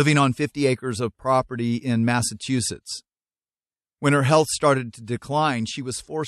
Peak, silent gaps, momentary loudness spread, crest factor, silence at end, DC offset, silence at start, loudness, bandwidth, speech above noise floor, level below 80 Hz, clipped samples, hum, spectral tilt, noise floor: -4 dBFS; none; 12 LU; 18 dB; 0 s; under 0.1%; 0 s; -23 LUFS; 13 kHz; over 68 dB; -56 dBFS; under 0.1%; none; -5 dB/octave; under -90 dBFS